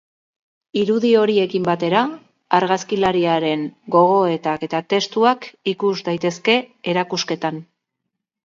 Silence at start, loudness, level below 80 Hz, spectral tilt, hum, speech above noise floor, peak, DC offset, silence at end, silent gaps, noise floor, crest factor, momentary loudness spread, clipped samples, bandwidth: 0.75 s; -19 LUFS; -64 dBFS; -5 dB/octave; none; 61 dB; 0 dBFS; under 0.1%; 0.8 s; none; -79 dBFS; 18 dB; 8 LU; under 0.1%; 7.6 kHz